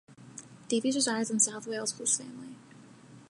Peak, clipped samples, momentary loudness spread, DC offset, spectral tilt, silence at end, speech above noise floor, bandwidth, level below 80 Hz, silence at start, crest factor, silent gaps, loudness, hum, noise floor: -12 dBFS; under 0.1%; 21 LU; under 0.1%; -2 dB/octave; 0.05 s; 23 dB; 11.5 kHz; -80 dBFS; 0.1 s; 22 dB; none; -29 LUFS; none; -53 dBFS